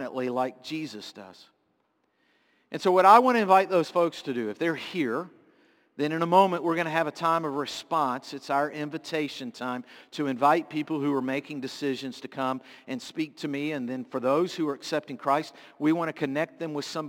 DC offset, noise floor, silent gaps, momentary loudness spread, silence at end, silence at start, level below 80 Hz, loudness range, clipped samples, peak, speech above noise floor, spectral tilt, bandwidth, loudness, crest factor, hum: under 0.1%; -72 dBFS; none; 14 LU; 0 s; 0 s; -80 dBFS; 7 LU; under 0.1%; -4 dBFS; 46 dB; -5.5 dB/octave; 17 kHz; -27 LUFS; 24 dB; none